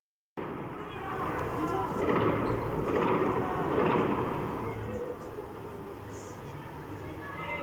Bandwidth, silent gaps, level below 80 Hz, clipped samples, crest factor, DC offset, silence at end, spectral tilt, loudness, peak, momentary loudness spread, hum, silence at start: over 20 kHz; none; -52 dBFS; under 0.1%; 18 dB; under 0.1%; 0 s; -7.5 dB/octave; -32 LUFS; -14 dBFS; 15 LU; none; 0.35 s